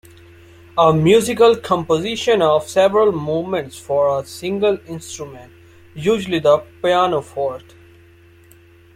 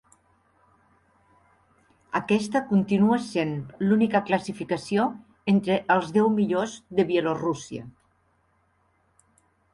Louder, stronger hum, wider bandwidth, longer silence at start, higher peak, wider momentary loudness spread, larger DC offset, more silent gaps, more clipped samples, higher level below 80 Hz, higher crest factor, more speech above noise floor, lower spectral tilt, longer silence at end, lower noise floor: first, -17 LUFS vs -25 LUFS; neither; first, 15.5 kHz vs 11.5 kHz; second, 0.75 s vs 2.15 s; first, -2 dBFS vs -8 dBFS; first, 12 LU vs 9 LU; neither; neither; neither; first, -54 dBFS vs -64 dBFS; about the same, 16 dB vs 18 dB; second, 31 dB vs 43 dB; about the same, -5.5 dB/octave vs -6.5 dB/octave; second, 1.35 s vs 1.85 s; second, -47 dBFS vs -67 dBFS